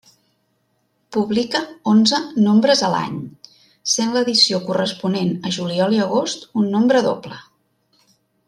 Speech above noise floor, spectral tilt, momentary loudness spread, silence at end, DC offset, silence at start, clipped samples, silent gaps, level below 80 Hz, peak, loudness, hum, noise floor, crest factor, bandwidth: 49 dB; -4 dB/octave; 13 LU; 1.05 s; under 0.1%; 1.1 s; under 0.1%; none; -64 dBFS; -2 dBFS; -18 LUFS; none; -67 dBFS; 18 dB; 11.5 kHz